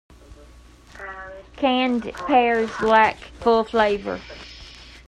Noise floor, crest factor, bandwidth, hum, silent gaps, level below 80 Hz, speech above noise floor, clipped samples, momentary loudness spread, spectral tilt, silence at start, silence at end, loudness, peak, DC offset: -47 dBFS; 18 dB; 10.5 kHz; none; none; -48 dBFS; 27 dB; under 0.1%; 21 LU; -5 dB/octave; 0.3 s; 0.1 s; -20 LUFS; -4 dBFS; under 0.1%